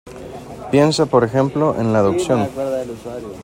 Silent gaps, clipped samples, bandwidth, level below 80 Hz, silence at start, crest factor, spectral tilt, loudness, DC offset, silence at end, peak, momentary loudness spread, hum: none; under 0.1%; 16.5 kHz; -48 dBFS; 0.05 s; 16 dB; -6.5 dB/octave; -17 LUFS; under 0.1%; 0 s; 0 dBFS; 18 LU; none